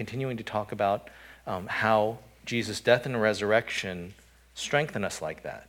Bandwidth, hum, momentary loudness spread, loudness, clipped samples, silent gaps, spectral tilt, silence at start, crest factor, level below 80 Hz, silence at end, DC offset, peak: 18 kHz; none; 16 LU; -28 LUFS; under 0.1%; none; -4.5 dB/octave; 0 s; 22 dB; -60 dBFS; 0.05 s; under 0.1%; -6 dBFS